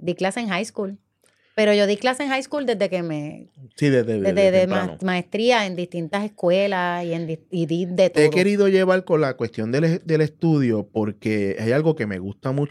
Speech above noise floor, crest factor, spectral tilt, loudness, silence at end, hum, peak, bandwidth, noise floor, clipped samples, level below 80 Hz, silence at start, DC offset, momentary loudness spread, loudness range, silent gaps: 42 dB; 16 dB; -6 dB/octave; -21 LUFS; 0 s; none; -4 dBFS; 13 kHz; -63 dBFS; under 0.1%; -66 dBFS; 0 s; under 0.1%; 10 LU; 3 LU; none